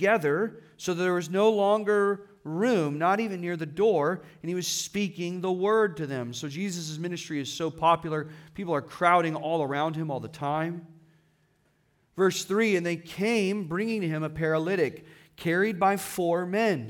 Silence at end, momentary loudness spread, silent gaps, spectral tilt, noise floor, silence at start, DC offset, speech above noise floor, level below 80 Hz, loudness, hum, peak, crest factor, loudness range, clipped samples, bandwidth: 0 s; 10 LU; none; -5 dB/octave; -68 dBFS; 0 s; under 0.1%; 41 dB; -66 dBFS; -27 LUFS; none; -8 dBFS; 20 dB; 4 LU; under 0.1%; 18 kHz